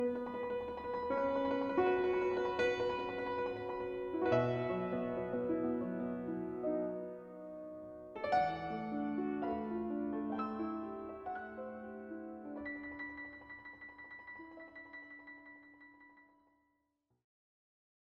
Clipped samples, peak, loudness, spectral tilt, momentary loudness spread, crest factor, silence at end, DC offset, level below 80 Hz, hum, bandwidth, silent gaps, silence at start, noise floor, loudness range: under 0.1%; -20 dBFS; -38 LUFS; -7.5 dB/octave; 17 LU; 18 dB; 1.9 s; under 0.1%; -66 dBFS; none; 7.2 kHz; none; 0 s; -82 dBFS; 17 LU